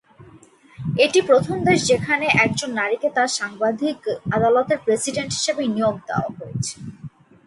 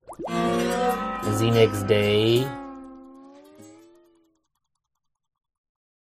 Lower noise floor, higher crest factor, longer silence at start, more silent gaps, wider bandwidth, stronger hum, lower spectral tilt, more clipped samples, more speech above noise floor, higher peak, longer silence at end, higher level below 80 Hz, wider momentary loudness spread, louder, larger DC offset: second, -49 dBFS vs -79 dBFS; about the same, 18 dB vs 20 dB; about the same, 0.2 s vs 0.1 s; neither; second, 11.5 kHz vs 15.5 kHz; neither; second, -4 dB/octave vs -5.5 dB/octave; neither; second, 29 dB vs 59 dB; about the same, -4 dBFS vs -6 dBFS; second, 0.4 s vs 2.3 s; about the same, -54 dBFS vs -52 dBFS; second, 11 LU vs 18 LU; first, -20 LUFS vs -23 LUFS; neither